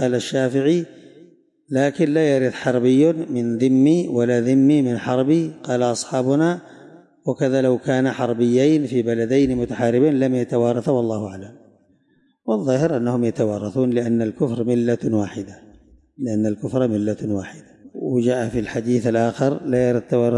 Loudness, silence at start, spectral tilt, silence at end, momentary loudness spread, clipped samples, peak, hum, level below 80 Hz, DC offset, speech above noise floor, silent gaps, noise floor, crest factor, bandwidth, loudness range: -20 LUFS; 0 s; -7 dB/octave; 0 s; 9 LU; under 0.1%; -6 dBFS; none; -54 dBFS; under 0.1%; 43 dB; none; -61 dBFS; 14 dB; 11.5 kHz; 5 LU